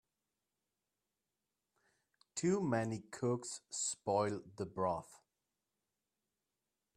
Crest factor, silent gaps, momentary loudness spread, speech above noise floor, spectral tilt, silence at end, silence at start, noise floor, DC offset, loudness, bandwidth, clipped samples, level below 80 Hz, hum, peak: 22 dB; none; 9 LU; over 52 dB; -5 dB/octave; 1.8 s; 2.35 s; under -90 dBFS; under 0.1%; -39 LUFS; 14 kHz; under 0.1%; -78 dBFS; none; -20 dBFS